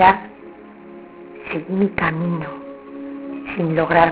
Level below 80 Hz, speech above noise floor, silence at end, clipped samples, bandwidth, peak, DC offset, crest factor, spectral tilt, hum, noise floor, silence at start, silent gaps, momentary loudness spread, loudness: -48 dBFS; 23 dB; 0 s; under 0.1%; 4 kHz; 0 dBFS; under 0.1%; 20 dB; -10 dB/octave; none; -40 dBFS; 0 s; none; 23 LU; -21 LUFS